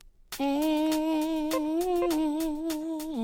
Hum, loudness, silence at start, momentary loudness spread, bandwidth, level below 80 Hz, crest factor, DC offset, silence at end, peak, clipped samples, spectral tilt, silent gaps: none; -29 LUFS; 0.05 s; 6 LU; 18 kHz; -52 dBFS; 12 dB; under 0.1%; 0 s; -16 dBFS; under 0.1%; -3.5 dB/octave; none